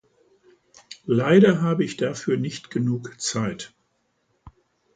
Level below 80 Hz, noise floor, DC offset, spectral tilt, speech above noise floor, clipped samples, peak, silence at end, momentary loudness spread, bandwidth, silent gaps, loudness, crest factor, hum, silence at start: -60 dBFS; -70 dBFS; under 0.1%; -6 dB/octave; 49 dB; under 0.1%; -4 dBFS; 0.45 s; 21 LU; 9.4 kHz; none; -22 LUFS; 20 dB; none; 0.9 s